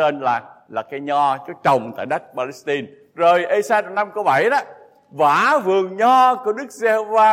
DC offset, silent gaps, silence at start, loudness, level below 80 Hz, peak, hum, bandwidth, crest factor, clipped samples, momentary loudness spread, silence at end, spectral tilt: under 0.1%; none; 0 s; -18 LUFS; -70 dBFS; -4 dBFS; none; 16 kHz; 14 dB; under 0.1%; 12 LU; 0 s; -4.5 dB/octave